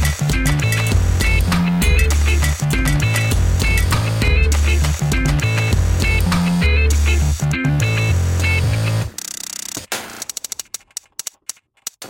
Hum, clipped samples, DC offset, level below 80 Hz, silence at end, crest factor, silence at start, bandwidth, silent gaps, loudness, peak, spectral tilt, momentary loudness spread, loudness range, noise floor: none; under 0.1%; under 0.1%; -20 dBFS; 0 s; 12 dB; 0 s; 17 kHz; none; -17 LUFS; -4 dBFS; -4.5 dB/octave; 12 LU; 5 LU; -36 dBFS